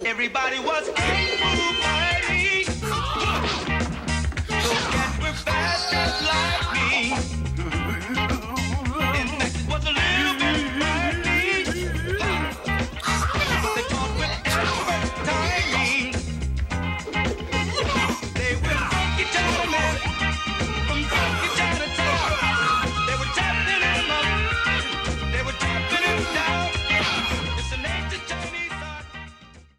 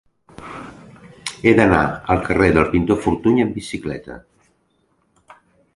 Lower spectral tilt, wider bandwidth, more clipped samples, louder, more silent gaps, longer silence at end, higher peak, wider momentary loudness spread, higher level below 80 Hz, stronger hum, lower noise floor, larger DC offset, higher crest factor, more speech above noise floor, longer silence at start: second, -4 dB/octave vs -6.5 dB/octave; first, 16 kHz vs 11.5 kHz; neither; second, -23 LUFS vs -17 LUFS; neither; second, 0.15 s vs 1.55 s; second, -8 dBFS vs 0 dBFS; second, 6 LU vs 22 LU; first, -32 dBFS vs -38 dBFS; neither; second, -47 dBFS vs -64 dBFS; neither; about the same, 16 dB vs 20 dB; second, 24 dB vs 47 dB; second, 0 s vs 0.4 s